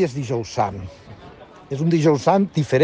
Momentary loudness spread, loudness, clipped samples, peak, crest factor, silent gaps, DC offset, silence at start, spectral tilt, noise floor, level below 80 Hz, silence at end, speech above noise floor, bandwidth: 15 LU; -20 LUFS; under 0.1%; -4 dBFS; 16 dB; none; under 0.1%; 0 s; -7 dB/octave; -43 dBFS; -52 dBFS; 0 s; 23 dB; 9.2 kHz